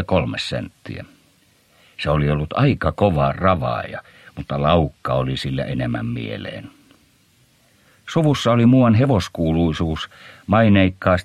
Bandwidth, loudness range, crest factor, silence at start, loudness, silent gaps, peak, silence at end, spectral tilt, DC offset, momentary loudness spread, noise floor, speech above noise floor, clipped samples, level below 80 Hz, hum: 13 kHz; 7 LU; 18 dB; 0 s; -19 LUFS; none; -2 dBFS; 0 s; -7 dB/octave; under 0.1%; 18 LU; -57 dBFS; 39 dB; under 0.1%; -38 dBFS; none